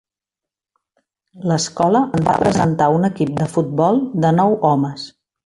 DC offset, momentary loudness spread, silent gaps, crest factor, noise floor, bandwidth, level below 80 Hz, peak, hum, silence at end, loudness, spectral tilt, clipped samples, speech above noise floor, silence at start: under 0.1%; 6 LU; none; 16 dB; -87 dBFS; 11.5 kHz; -50 dBFS; -2 dBFS; none; 0.35 s; -17 LUFS; -6.5 dB/octave; under 0.1%; 71 dB; 1.35 s